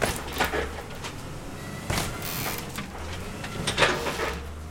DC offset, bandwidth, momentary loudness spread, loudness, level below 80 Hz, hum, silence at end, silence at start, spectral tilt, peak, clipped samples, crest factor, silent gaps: under 0.1%; 17 kHz; 13 LU; -29 LUFS; -42 dBFS; none; 0 s; 0 s; -3.5 dB/octave; -6 dBFS; under 0.1%; 24 dB; none